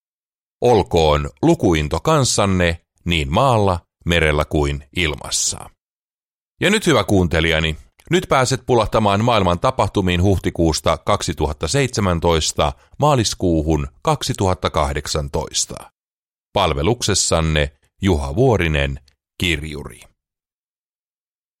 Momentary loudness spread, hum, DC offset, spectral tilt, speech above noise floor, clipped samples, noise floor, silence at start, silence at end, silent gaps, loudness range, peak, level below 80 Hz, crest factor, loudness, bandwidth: 7 LU; none; under 0.1%; -4.5 dB/octave; over 73 dB; under 0.1%; under -90 dBFS; 0.6 s; 1.65 s; 5.80-6.19 s, 6.25-6.55 s, 15.97-16.23 s, 16.30-16.51 s; 4 LU; -4 dBFS; -32 dBFS; 16 dB; -18 LUFS; 16 kHz